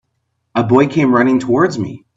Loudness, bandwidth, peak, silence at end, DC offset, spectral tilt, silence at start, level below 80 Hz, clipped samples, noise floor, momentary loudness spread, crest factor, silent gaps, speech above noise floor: -14 LUFS; 7.8 kHz; 0 dBFS; 0.2 s; under 0.1%; -7.5 dB/octave; 0.55 s; -54 dBFS; under 0.1%; -69 dBFS; 9 LU; 14 dB; none; 56 dB